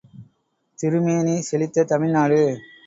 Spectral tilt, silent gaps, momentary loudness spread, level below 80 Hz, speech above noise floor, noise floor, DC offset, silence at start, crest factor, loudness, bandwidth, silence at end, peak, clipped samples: -7 dB/octave; none; 5 LU; -64 dBFS; 49 dB; -68 dBFS; under 0.1%; 0.15 s; 16 dB; -20 LUFS; 8 kHz; 0.25 s; -6 dBFS; under 0.1%